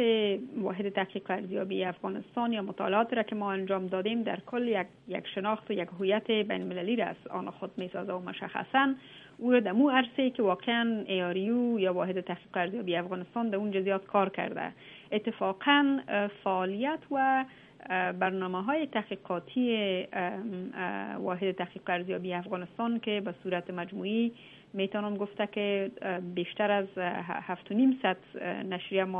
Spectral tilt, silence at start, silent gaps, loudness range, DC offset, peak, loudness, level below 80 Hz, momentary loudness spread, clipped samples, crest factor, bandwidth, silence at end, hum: -8 dB/octave; 0 s; none; 5 LU; under 0.1%; -10 dBFS; -31 LUFS; -76 dBFS; 9 LU; under 0.1%; 22 dB; 4 kHz; 0 s; none